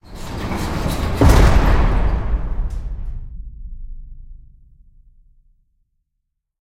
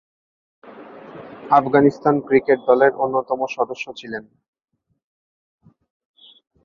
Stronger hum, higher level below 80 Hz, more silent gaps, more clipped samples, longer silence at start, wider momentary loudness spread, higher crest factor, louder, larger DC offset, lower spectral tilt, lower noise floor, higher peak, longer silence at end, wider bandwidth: neither; first, -20 dBFS vs -62 dBFS; neither; neither; second, 0.05 s vs 0.65 s; about the same, 24 LU vs 23 LU; about the same, 18 dB vs 20 dB; about the same, -19 LUFS vs -18 LUFS; neither; about the same, -6.5 dB/octave vs -7 dB/octave; first, -75 dBFS vs -40 dBFS; about the same, 0 dBFS vs -2 dBFS; about the same, 2.35 s vs 2.45 s; first, 16 kHz vs 7 kHz